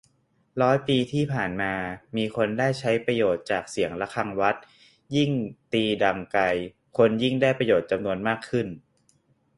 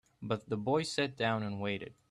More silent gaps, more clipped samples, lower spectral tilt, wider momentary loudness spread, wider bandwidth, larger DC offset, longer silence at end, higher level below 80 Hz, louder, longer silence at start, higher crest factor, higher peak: neither; neither; about the same, -6 dB/octave vs -5 dB/octave; about the same, 8 LU vs 6 LU; about the same, 11.5 kHz vs 12.5 kHz; neither; first, 0.8 s vs 0.2 s; first, -58 dBFS vs -70 dBFS; first, -25 LUFS vs -35 LUFS; first, 0.55 s vs 0.2 s; about the same, 20 dB vs 18 dB; first, -6 dBFS vs -18 dBFS